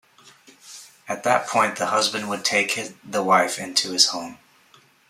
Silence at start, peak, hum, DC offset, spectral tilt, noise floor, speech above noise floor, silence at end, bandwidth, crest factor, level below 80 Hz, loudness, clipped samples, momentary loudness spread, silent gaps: 0.65 s; -2 dBFS; none; under 0.1%; -1.5 dB/octave; -56 dBFS; 33 dB; 0.75 s; 16 kHz; 22 dB; -72 dBFS; -21 LUFS; under 0.1%; 21 LU; none